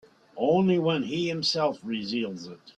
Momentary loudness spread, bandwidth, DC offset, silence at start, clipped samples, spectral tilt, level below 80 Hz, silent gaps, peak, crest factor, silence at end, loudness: 10 LU; 9.4 kHz; under 0.1%; 0.35 s; under 0.1%; -5.5 dB/octave; -68 dBFS; none; -12 dBFS; 16 dB; 0.1 s; -26 LUFS